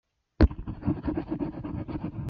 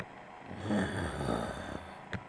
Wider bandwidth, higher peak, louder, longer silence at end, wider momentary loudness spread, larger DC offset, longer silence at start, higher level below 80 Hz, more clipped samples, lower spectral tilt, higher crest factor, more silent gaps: second, 5.8 kHz vs 11 kHz; first, -6 dBFS vs -20 dBFS; first, -30 LUFS vs -37 LUFS; about the same, 0 s vs 0 s; second, 10 LU vs 13 LU; neither; first, 0.4 s vs 0 s; first, -34 dBFS vs -52 dBFS; neither; first, -10 dB/octave vs -6 dB/octave; first, 24 dB vs 18 dB; neither